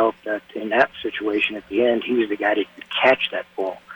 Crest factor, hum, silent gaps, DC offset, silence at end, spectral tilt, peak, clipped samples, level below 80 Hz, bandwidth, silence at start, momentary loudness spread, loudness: 18 dB; none; none; under 0.1%; 0 s; -5.5 dB/octave; -4 dBFS; under 0.1%; -62 dBFS; 19 kHz; 0 s; 10 LU; -21 LUFS